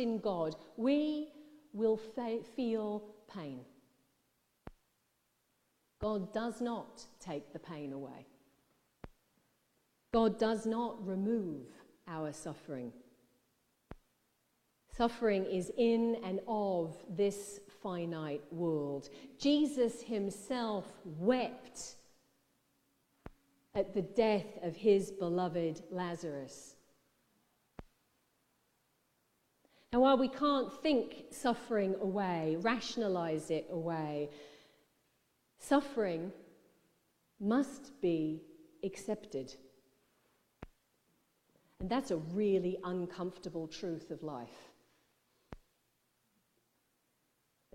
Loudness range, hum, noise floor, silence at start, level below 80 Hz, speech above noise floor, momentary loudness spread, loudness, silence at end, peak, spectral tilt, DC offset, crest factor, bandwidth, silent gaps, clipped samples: 11 LU; none; -79 dBFS; 0 s; -66 dBFS; 44 dB; 15 LU; -36 LUFS; 2.2 s; -16 dBFS; -6 dB/octave; under 0.1%; 22 dB; 15.5 kHz; none; under 0.1%